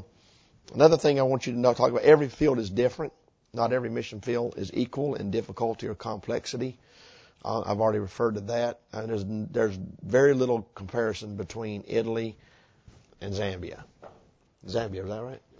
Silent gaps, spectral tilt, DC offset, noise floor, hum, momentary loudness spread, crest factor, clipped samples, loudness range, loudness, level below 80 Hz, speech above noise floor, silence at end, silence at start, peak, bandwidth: none; -6.5 dB/octave; under 0.1%; -61 dBFS; none; 16 LU; 24 dB; under 0.1%; 11 LU; -27 LUFS; -54 dBFS; 34 dB; 0.2 s; 0 s; -4 dBFS; 8 kHz